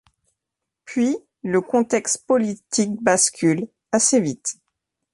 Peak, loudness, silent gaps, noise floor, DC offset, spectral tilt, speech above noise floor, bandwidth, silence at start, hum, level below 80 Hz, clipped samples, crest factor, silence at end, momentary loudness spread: -4 dBFS; -21 LUFS; none; -84 dBFS; under 0.1%; -3.5 dB/octave; 64 dB; 11.5 kHz; 0.85 s; none; -66 dBFS; under 0.1%; 18 dB; 0.6 s; 11 LU